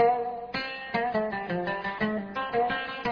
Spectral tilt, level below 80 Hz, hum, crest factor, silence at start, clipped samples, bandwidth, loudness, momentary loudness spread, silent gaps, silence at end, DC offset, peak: -7 dB/octave; -58 dBFS; none; 18 dB; 0 s; under 0.1%; 5.4 kHz; -30 LUFS; 5 LU; none; 0 s; under 0.1%; -12 dBFS